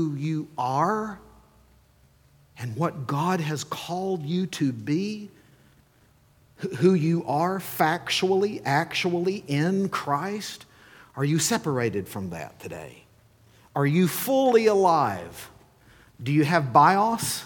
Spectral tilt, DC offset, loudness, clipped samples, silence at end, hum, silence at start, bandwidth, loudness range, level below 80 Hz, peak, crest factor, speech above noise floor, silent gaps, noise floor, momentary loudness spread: -5.5 dB/octave; under 0.1%; -24 LUFS; under 0.1%; 0 s; none; 0 s; 19 kHz; 7 LU; -64 dBFS; -4 dBFS; 20 dB; 35 dB; none; -60 dBFS; 18 LU